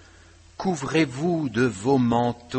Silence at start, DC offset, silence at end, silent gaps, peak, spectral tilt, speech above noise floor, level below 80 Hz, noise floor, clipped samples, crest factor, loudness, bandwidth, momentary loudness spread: 0.6 s; under 0.1%; 0 s; none; -8 dBFS; -6 dB/octave; 28 dB; -54 dBFS; -51 dBFS; under 0.1%; 16 dB; -24 LUFS; 8.8 kHz; 7 LU